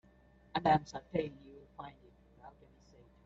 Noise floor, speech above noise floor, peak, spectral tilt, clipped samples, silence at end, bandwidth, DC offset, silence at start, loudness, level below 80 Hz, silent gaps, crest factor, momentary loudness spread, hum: -64 dBFS; 30 dB; -18 dBFS; -6.5 dB/octave; under 0.1%; 0.75 s; 7.8 kHz; under 0.1%; 0.55 s; -35 LUFS; -62 dBFS; none; 22 dB; 27 LU; none